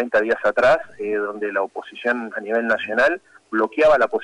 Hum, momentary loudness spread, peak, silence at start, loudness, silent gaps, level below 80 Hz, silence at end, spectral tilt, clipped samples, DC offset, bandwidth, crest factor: none; 10 LU; -8 dBFS; 0 s; -20 LUFS; none; -56 dBFS; 0 s; -5 dB/octave; under 0.1%; under 0.1%; 10.5 kHz; 12 dB